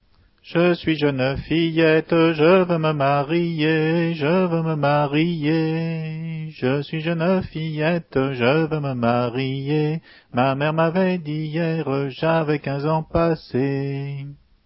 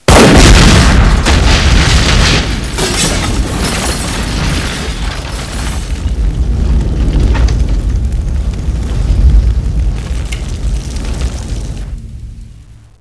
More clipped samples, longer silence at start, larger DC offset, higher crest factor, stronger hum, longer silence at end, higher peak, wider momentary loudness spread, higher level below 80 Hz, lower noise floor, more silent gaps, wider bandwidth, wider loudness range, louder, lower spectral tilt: second, under 0.1% vs 1%; first, 0.45 s vs 0.1 s; second, under 0.1% vs 0.5%; first, 16 dB vs 10 dB; neither; about the same, 0.3 s vs 0.3 s; second, -4 dBFS vs 0 dBFS; second, 9 LU vs 14 LU; second, -50 dBFS vs -12 dBFS; first, -51 dBFS vs -34 dBFS; neither; second, 5.8 kHz vs 11 kHz; second, 4 LU vs 7 LU; second, -21 LUFS vs -12 LUFS; first, -11.5 dB/octave vs -4.5 dB/octave